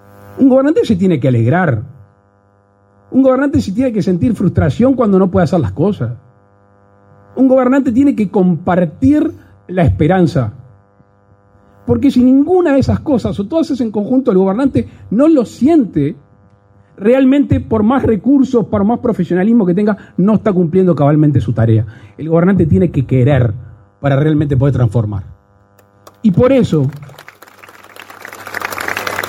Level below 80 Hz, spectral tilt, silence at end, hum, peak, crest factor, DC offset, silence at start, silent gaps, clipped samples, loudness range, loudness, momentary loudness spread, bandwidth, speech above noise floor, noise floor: -38 dBFS; -8.5 dB/octave; 0 s; none; 0 dBFS; 12 dB; under 0.1%; 0.3 s; none; under 0.1%; 3 LU; -13 LUFS; 10 LU; 16.5 kHz; 40 dB; -52 dBFS